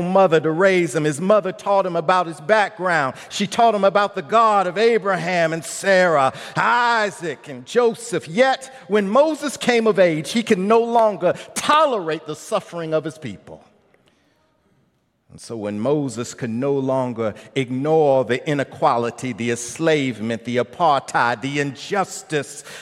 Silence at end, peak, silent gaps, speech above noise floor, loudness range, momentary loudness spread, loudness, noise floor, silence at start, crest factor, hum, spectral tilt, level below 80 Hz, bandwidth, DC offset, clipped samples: 0 s; -2 dBFS; none; 45 dB; 9 LU; 10 LU; -19 LUFS; -64 dBFS; 0 s; 18 dB; none; -5 dB/octave; -68 dBFS; 14.5 kHz; under 0.1%; under 0.1%